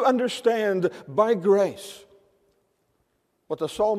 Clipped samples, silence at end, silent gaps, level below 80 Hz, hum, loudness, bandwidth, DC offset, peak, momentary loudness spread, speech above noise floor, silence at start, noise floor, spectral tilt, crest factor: under 0.1%; 0 s; none; -66 dBFS; none; -23 LUFS; 15 kHz; under 0.1%; -8 dBFS; 14 LU; 48 dB; 0 s; -71 dBFS; -5.5 dB/octave; 18 dB